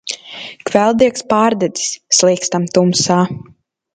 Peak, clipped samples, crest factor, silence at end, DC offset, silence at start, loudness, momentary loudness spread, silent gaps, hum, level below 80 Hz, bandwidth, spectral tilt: 0 dBFS; under 0.1%; 16 dB; 0.5 s; under 0.1%; 0.05 s; -14 LUFS; 14 LU; none; none; -54 dBFS; 9.6 kHz; -4 dB/octave